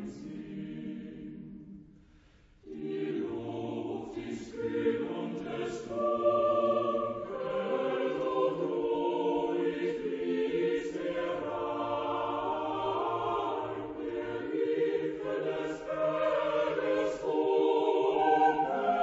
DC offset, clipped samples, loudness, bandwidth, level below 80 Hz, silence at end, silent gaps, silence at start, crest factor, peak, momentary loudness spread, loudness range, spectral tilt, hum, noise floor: under 0.1%; under 0.1%; -32 LUFS; 8 kHz; -64 dBFS; 0 s; none; 0 s; 16 dB; -16 dBFS; 13 LU; 9 LU; -6.5 dB/octave; none; -60 dBFS